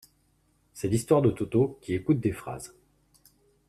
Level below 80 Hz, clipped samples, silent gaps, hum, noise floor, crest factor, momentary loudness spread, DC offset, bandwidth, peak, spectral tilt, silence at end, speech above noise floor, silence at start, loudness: -56 dBFS; under 0.1%; none; none; -68 dBFS; 20 dB; 16 LU; under 0.1%; 14 kHz; -10 dBFS; -7.5 dB/octave; 1 s; 42 dB; 0.75 s; -27 LUFS